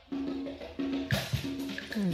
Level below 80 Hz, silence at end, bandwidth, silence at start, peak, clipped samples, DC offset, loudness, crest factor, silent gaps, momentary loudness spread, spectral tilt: -52 dBFS; 0 s; 16 kHz; 0 s; -16 dBFS; under 0.1%; under 0.1%; -35 LUFS; 18 dB; none; 6 LU; -5.5 dB/octave